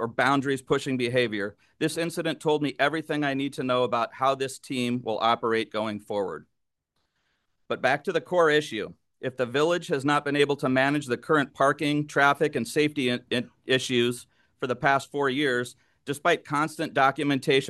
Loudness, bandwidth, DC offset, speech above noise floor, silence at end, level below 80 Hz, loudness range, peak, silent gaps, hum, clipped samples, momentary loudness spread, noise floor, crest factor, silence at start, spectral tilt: -26 LUFS; 12.5 kHz; under 0.1%; 53 dB; 0 s; -70 dBFS; 4 LU; -6 dBFS; none; none; under 0.1%; 8 LU; -79 dBFS; 20 dB; 0 s; -5 dB/octave